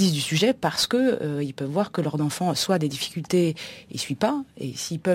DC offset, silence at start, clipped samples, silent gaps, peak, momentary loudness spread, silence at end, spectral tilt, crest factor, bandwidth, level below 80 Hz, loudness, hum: under 0.1%; 0 s; under 0.1%; none; -6 dBFS; 9 LU; 0 s; -5 dB/octave; 18 dB; 16.5 kHz; -62 dBFS; -25 LUFS; none